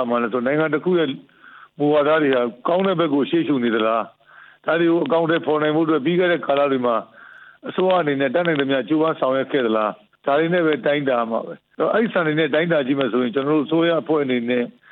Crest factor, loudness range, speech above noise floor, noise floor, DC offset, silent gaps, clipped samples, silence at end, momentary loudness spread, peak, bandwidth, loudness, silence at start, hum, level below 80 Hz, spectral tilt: 14 dB; 1 LU; 25 dB; -45 dBFS; under 0.1%; none; under 0.1%; 0.2 s; 6 LU; -6 dBFS; 4.3 kHz; -20 LUFS; 0 s; none; -72 dBFS; -9.5 dB/octave